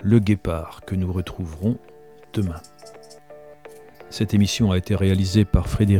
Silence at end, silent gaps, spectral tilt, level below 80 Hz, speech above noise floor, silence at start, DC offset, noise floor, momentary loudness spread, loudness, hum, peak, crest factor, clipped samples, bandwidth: 0 s; none; -6.5 dB/octave; -36 dBFS; 24 dB; 0 s; 0.2%; -45 dBFS; 16 LU; -22 LUFS; none; -2 dBFS; 20 dB; under 0.1%; 15 kHz